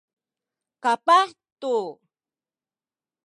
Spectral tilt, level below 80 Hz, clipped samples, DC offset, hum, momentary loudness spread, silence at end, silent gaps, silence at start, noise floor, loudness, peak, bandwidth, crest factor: -2.5 dB/octave; -88 dBFS; under 0.1%; under 0.1%; none; 14 LU; 1.35 s; 1.52-1.56 s; 0.85 s; under -90 dBFS; -22 LUFS; -6 dBFS; 11.5 kHz; 20 dB